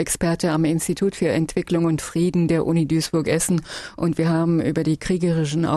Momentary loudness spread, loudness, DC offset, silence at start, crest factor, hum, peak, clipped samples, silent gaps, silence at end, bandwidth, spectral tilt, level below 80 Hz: 3 LU; -21 LUFS; under 0.1%; 0 s; 14 dB; none; -6 dBFS; under 0.1%; none; 0 s; 13 kHz; -6 dB/octave; -46 dBFS